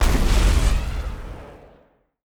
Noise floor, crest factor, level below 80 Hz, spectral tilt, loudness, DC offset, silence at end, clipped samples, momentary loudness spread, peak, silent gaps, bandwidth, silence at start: -57 dBFS; 14 dB; -22 dBFS; -5 dB/octave; -22 LUFS; under 0.1%; 0.7 s; under 0.1%; 20 LU; -6 dBFS; none; 17 kHz; 0 s